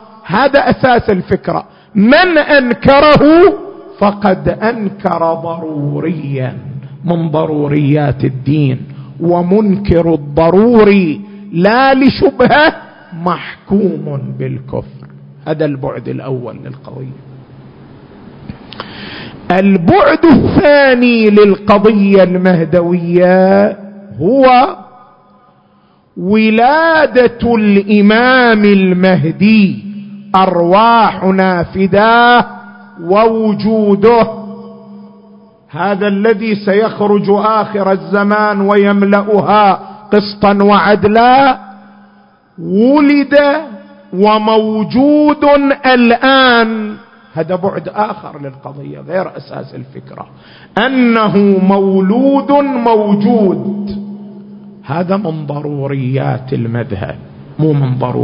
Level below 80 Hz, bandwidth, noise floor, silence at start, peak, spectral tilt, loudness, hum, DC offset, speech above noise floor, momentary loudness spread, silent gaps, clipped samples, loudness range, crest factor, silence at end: -40 dBFS; 5.4 kHz; -49 dBFS; 0.25 s; 0 dBFS; -9.5 dB/octave; -10 LUFS; none; under 0.1%; 39 dB; 19 LU; none; 0.1%; 10 LU; 10 dB; 0 s